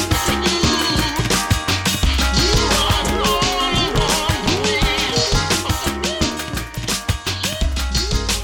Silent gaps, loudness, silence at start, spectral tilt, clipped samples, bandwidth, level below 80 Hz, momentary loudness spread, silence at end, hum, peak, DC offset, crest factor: none; -18 LUFS; 0 s; -3.5 dB/octave; under 0.1%; 17.5 kHz; -26 dBFS; 5 LU; 0 s; none; -4 dBFS; under 0.1%; 14 dB